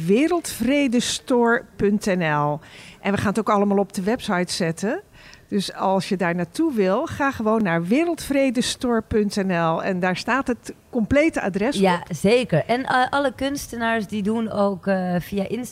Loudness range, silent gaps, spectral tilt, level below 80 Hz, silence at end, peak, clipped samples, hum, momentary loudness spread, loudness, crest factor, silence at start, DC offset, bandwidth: 2 LU; none; -5 dB/octave; -50 dBFS; 0 s; -6 dBFS; under 0.1%; none; 7 LU; -22 LUFS; 16 dB; 0 s; under 0.1%; 16 kHz